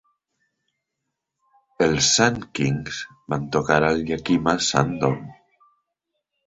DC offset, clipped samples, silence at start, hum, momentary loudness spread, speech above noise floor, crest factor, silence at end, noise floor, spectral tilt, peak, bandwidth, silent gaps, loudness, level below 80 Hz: under 0.1%; under 0.1%; 1.8 s; none; 12 LU; 59 dB; 22 dB; 1.15 s; -81 dBFS; -4 dB/octave; -2 dBFS; 8 kHz; none; -21 LUFS; -50 dBFS